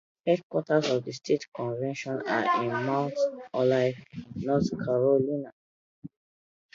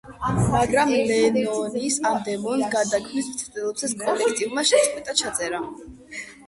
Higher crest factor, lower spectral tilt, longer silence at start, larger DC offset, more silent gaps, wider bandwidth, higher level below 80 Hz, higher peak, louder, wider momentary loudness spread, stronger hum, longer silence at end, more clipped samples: about the same, 18 dB vs 18 dB; first, -6.5 dB/octave vs -3.5 dB/octave; first, 0.25 s vs 0.05 s; neither; first, 0.43-0.50 s, 1.48-1.52 s, 5.52-6.02 s vs none; second, 7.6 kHz vs 11.5 kHz; second, -64 dBFS vs -48 dBFS; second, -10 dBFS vs -4 dBFS; second, -28 LUFS vs -22 LUFS; about the same, 9 LU vs 10 LU; neither; first, 0.7 s vs 0.05 s; neither